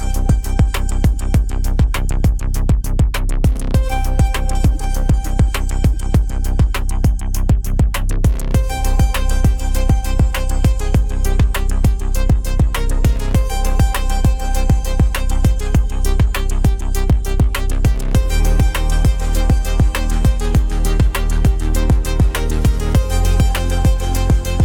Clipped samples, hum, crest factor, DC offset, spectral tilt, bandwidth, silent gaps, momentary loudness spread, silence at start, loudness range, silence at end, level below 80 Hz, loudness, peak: under 0.1%; none; 12 dB; under 0.1%; -6 dB/octave; 17.5 kHz; none; 2 LU; 0 s; 1 LU; 0 s; -16 dBFS; -18 LUFS; -2 dBFS